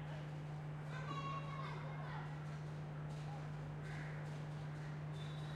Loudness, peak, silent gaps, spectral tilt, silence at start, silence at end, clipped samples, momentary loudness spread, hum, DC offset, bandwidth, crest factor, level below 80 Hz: -47 LUFS; -34 dBFS; none; -7 dB/octave; 0 s; 0 s; under 0.1%; 3 LU; none; under 0.1%; 9.8 kHz; 12 dB; -66 dBFS